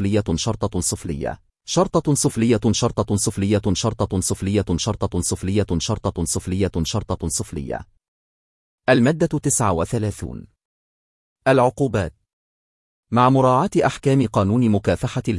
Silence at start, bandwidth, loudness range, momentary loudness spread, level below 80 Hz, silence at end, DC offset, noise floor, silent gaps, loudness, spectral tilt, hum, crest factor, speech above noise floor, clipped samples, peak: 0 s; 12 kHz; 4 LU; 10 LU; -42 dBFS; 0 s; under 0.1%; under -90 dBFS; 8.08-8.78 s, 10.65-11.36 s, 12.33-13.03 s; -20 LUFS; -5 dB/octave; none; 18 dB; over 70 dB; under 0.1%; -4 dBFS